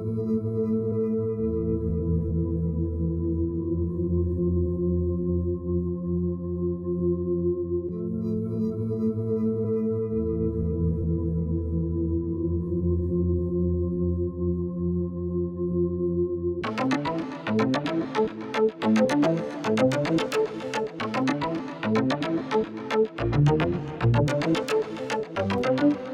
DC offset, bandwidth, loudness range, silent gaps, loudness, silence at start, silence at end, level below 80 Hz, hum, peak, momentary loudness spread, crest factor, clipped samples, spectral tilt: under 0.1%; 10.5 kHz; 3 LU; none; -26 LUFS; 0 s; 0 s; -40 dBFS; none; -10 dBFS; 5 LU; 16 dB; under 0.1%; -7.5 dB/octave